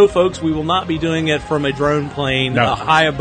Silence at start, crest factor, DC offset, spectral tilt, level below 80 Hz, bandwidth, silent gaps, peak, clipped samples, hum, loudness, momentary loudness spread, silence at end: 0 s; 16 dB; under 0.1%; -5.5 dB/octave; -40 dBFS; 9.4 kHz; none; 0 dBFS; under 0.1%; none; -17 LUFS; 5 LU; 0 s